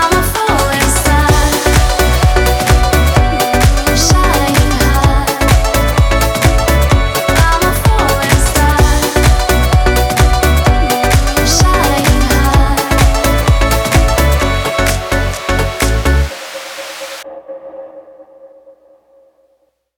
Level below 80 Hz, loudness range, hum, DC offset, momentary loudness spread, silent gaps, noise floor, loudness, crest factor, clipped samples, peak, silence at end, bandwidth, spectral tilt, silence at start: -14 dBFS; 7 LU; none; under 0.1%; 5 LU; none; -59 dBFS; -11 LUFS; 10 dB; under 0.1%; -2 dBFS; 1.5 s; over 20 kHz; -4.5 dB/octave; 0 s